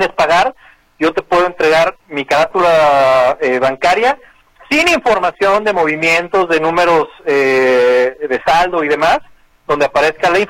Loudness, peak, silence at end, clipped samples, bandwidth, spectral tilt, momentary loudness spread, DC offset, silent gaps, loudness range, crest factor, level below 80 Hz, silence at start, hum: -13 LUFS; 0 dBFS; 0 s; under 0.1%; 16 kHz; -4 dB/octave; 6 LU; under 0.1%; none; 1 LU; 12 dB; -44 dBFS; 0 s; none